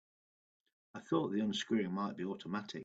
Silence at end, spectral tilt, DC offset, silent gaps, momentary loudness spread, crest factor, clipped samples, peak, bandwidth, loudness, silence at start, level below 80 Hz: 0 s; -5.5 dB/octave; under 0.1%; none; 10 LU; 18 dB; under 0.1%; -20 dBFS; 8 kHz; -37 LUFS; 0.95 s; -78 dBFS